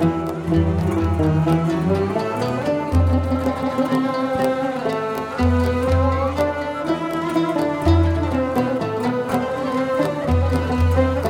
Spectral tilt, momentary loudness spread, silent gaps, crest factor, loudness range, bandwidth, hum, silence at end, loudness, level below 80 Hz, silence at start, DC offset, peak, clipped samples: -7.5 dB/octave; 5 LU; none; 14 dB; 1 LU; 15.5 kHz; none; 0 s; -20 LUFS; -32 dBFS; 0 s; under 0.1%; -4 dBFS; under 0.1%